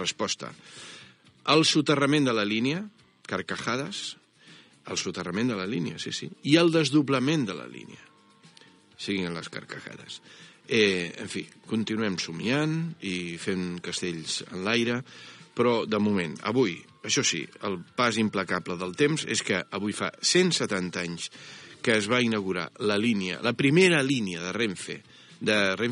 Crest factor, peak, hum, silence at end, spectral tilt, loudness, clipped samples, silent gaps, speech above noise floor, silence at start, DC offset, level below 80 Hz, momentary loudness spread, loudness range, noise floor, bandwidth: 20 dB; -6 dBFS; none; 0 s; -4 dB/octave; -26 LUFS; under 0.1%; none; 30 dB; 0 s; under 0.1%; -72 dBFS; 16 LU; 6 LU; -57 dBFS; 10.5 kHz